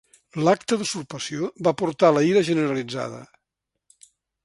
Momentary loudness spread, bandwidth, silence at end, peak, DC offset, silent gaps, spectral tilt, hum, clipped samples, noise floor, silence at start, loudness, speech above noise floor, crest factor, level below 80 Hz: 13 LU; 11.5 kHz; 1.2 s; -4 dBFS; under 0.1%; none; -5 dB/octave; none; under 0.1%; -82 dBFS; 0.35 s; -22 LUFS; 60 dB; 20 dB; -66 dBFS